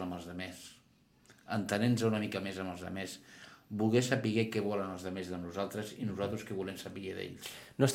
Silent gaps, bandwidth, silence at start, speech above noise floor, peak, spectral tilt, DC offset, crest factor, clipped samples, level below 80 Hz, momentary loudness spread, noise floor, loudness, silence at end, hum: none; 16.5 kHz; 0 s; 31 dB; -12 dBFS; -5.5 dB/octave; under 0.1%; 24 dB; under 0.1%; -70 dBFS; 14 LU; -66 dBFS; -36 LUFS; 0 s; none